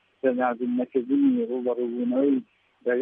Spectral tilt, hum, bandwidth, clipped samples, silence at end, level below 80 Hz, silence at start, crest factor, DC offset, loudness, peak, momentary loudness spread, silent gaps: -10 dB/octave; none; 3.7 kHz; under 0.1%; 0 s; -80 dBFS; 0.25 s; 14 dB; under 0.1%; -25 LUFS; -10 dBFS; 5 LU; none